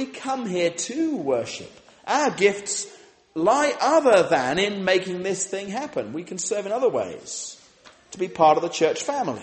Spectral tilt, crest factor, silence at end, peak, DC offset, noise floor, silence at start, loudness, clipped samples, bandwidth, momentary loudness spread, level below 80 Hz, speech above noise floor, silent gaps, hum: -3.5 dB/octave; 18 dB; 0 s; -4 dBFS; under 0.1%; -52 dBFS; 0 s; -23 LUFS; under 0.1%; 8.8 kHz; 14 LU; -66 dBFS; 29 dB; none; none